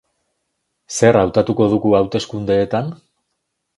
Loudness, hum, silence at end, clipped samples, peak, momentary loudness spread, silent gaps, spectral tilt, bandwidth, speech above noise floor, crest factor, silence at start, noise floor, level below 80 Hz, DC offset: -16 LUFS; none; 0.85 s; under 0.1%; 0 dBFS; 9 LU; none; -6 dB/octave; 11.5 kHz; 58 dB; 18 dB; 0.9 s; -74 dBFS; -46 dBFS; under 0.1%